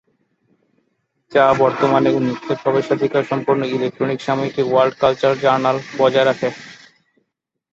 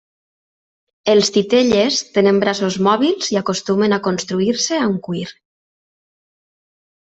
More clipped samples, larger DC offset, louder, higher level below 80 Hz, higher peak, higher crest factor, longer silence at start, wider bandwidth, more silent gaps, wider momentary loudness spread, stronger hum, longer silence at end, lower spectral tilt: neither; neither; about the same, -17 LUFS vs -16 LUFS; about the same, -58 dBFS vs -58 dBFS; about the same, -2 dBFS vs -2 dBFS; about the same, 18 dB vs 16 dB; first, 1.3 s vs 1.05 s; about the same, 7.8 kHz vs 8.2 kHz; neither; about the same, 7 LU vs 7 LU; neither; second, 1 s vs 1.7 s; first, -6.5 dB/octave vs -4 dB/octave